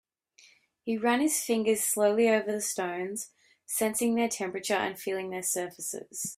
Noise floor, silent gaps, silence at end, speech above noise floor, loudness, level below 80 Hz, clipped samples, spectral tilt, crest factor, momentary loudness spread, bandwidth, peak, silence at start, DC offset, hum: -61 dBFS; none; 0.05 s; 32 dB; -29 LUFS; -74 dBFS; under 0.1%; -3 dB/octave; 18 dB; 10 LU; 16 kHz; -12 dBFS; 0.85 s; under 0.1%; none